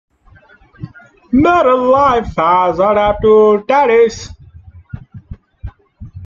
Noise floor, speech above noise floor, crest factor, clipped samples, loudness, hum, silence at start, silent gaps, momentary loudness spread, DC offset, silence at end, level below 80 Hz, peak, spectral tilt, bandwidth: -46 dBFS; 35 dB; 12 dB; under 0.1%; -11 LUFS; none; 0.8 s; none; 24 LU; under 0.1%; 0 s; -38 dBFS; 0 dBFS; -6.5 dB/octave; 7.4 kHz